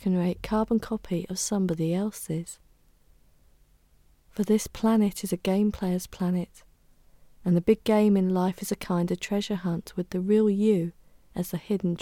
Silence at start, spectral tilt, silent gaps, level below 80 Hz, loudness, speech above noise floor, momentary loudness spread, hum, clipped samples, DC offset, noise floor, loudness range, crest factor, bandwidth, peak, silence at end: 0 s; -6.5 dB/octave; none; -54 dBFS; -27 LUFS; 35 dB; 11 LU; none; under 0.1%; under 0.1%; -61 dBFS; 6 LU; 18 dB; 17.5 kHz; -8 dBFS; 0 s